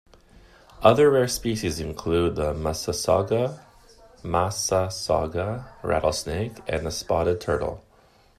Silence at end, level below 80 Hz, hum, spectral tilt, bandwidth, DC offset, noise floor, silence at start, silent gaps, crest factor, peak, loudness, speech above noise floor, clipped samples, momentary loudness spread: 0.6 s; -44 dBFS; none; -5 dB/octave; 14.5 kHz; under 0.1%; -57 dBFS; 0.8 s; none; 22 dB; -2 dBFS; -24 LUFS; 34 dB; under 0.1%; 11 LU